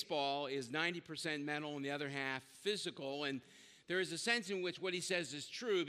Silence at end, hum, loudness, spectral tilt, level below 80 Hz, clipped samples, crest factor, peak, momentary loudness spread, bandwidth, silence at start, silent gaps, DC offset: 0 s; none; -40 LUFS; -3.5 dB/octave; -88 dBFS; under 0.1%; 22 dB; -20 dBFS; 7 LU; 14.5 kHz; 0 s; none; under 0.1%